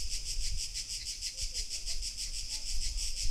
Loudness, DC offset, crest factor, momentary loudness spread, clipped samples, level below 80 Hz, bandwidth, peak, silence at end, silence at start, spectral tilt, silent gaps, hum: -36 LUFS; under 0.1%; 14 dB; 1 LU; under 0.1%; -38 dBFS; 15 kHz; -20 dBFS; 0 s; 0 s; 0.5 dB/octave; none; none